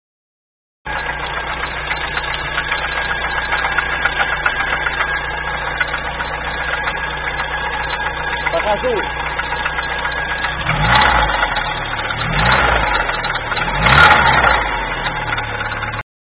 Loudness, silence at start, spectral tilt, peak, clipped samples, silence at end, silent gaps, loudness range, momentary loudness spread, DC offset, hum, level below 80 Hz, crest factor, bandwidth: -17 LUFS; 0.85 s; -6 dB/octave; 0 dBFS; under 0.1%; 0.35 s; none; 6 LU; 9 LU; under 0.1%; none; -30 dBFS; 18 dB; 9.8 kHz